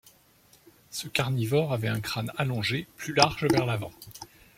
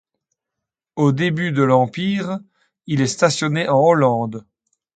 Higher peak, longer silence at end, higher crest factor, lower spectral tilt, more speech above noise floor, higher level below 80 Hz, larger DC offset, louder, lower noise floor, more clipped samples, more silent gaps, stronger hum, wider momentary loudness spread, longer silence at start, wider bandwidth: about the same, -2 dBFS vs 0 dBFS; second, 0.35 s vs 0.55 s; first, 28 dB vs 18 dB; about the same, -5 dB/octave vs -6 dB/octave; second, 33 dB vs 66 dB; about the same, -58 dBFS vs -60 dBFS; neither; second, -27 LUFS vs -18 LUFS; second, -60 dBFS vs -83 dBFS; neither; neither; neither; first, 16 LU vs 13 LU; about the same, 0.9 s vs 0.95 s; first, 16.5 kHz vs 9.4 kHz